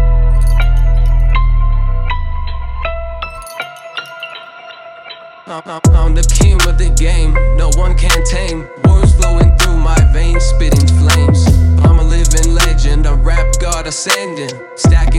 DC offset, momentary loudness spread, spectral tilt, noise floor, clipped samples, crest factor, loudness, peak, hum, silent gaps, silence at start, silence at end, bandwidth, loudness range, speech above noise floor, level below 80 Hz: under 0.1%; 16 LU; -5 dB/octave; -33 dBFS; under 0.1%; 10 dB; -13 LUFS; 0 dBFS; none; none; 0 s; 0 s; 14 kHz; 11 LU; 23 dB; -12 dBFS